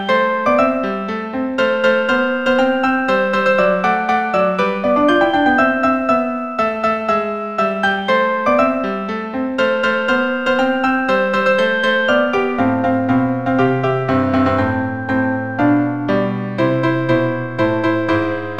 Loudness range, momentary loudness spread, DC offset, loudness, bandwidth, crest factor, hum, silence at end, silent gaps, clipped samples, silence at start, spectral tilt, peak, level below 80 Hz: 2 LU; 5 LU; 0.7%; -16 LUFS; 8.6 kHz; 14 dB; none; 0 s; none; under 0.1%; 0 s; -7 dB/octave; -2 dBFS; -50 dBFS